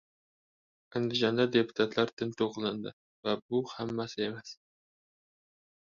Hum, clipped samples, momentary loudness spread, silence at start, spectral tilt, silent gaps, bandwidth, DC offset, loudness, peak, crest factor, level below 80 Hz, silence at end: none; under 0.1%; 12 LU; 0.95 s; -5.5 dB/octave; 2.13-2.17 s, 2.93-3.23 s, 3.42-3.49 s; 7.4 kHz; under 0.1%; -32 LUFS; -12 dBFS; 22 dB; -72 dBFS; 1.3 s